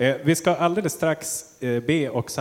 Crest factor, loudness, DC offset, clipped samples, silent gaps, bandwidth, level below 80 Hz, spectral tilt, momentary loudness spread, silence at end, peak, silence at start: 16 dB; -23 LUFS; under 0.1%; under 0.1%; none; 17 kHz; -60 dBFS; -5 dB/octave; 7 LU; 0 s; -6 dBFS; 0 s